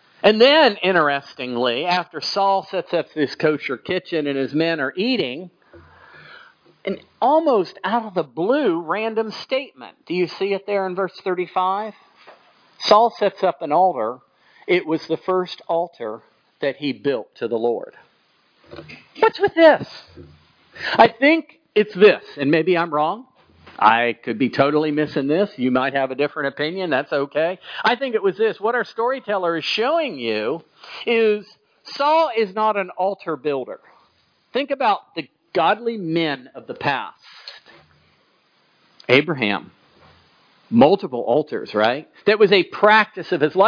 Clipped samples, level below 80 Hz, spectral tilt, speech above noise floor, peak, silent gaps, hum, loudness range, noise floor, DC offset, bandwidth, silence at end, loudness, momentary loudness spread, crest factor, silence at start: under 0.1%; -68 dBFS; -6 dB/octave; 41 dB; 0 dBFS; none; none; 6 LU; -61 dBFS; under 0.1%; 5.4 kHz; 0 s; -20 LUFS; 13 LU; 20 dB; 0.25 s